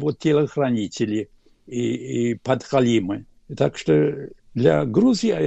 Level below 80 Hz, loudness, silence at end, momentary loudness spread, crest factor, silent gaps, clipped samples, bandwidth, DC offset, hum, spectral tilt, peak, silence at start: -54 dBFS; -21 LUFS; 0 s; 14 LU; 16 dB; none; under 0.1%; 8.4 kHz; under 0.1%; none; -6.5 dB/octave; -4 dBFS; 0 s